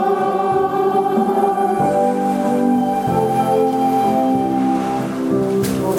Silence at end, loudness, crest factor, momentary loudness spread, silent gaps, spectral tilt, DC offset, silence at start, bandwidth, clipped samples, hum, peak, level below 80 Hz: 0 s; -17 LUFS; 12 dB; 2 LU; none; -7 dB/octave; under 0.1%; 0 s; 17.5 kHz; under 0.1%; none; -4 dBFS; -50 dBFS